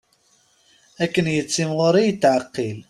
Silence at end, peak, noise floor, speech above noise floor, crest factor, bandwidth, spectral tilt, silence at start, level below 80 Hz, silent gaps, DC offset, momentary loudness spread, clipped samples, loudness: 0.1 s; -4 dBFS; -61 dBFS; 41 dB; 16 dB; 13.5 kHz; -5 dB/octave; 1 s; -60 dBFS; none; under 0.1%; 7 LU; under 0.1%; -20 LUFS